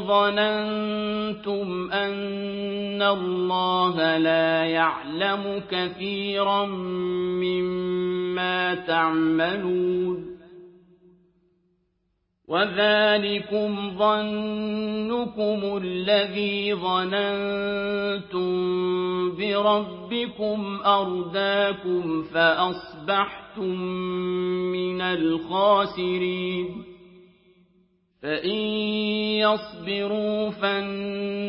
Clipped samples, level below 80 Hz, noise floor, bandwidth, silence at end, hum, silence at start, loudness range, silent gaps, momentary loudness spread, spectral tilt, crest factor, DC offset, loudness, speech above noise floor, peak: under 0.1%; -62 dBFS; -73 dBFS; 5.6 kHz; 0 s; none; 0 s; 3 LU; none; 8 LU; -9.5 dB/octave; 18 dB; under 0.1%; -24 LUFS; 49 dB; -6 dBFS